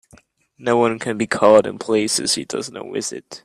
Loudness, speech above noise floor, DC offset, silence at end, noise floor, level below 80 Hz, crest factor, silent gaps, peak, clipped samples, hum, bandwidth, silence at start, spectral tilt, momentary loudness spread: -19 LUFS; 34 dB; under 0.1%; 0.05 s; -53 dBFS; -60 dBFS; 18 dB; none; 0 dBFS; under 0.1%; none; 13.5 kHz; 0.6 s; -3.5 dB/octave; 14 LU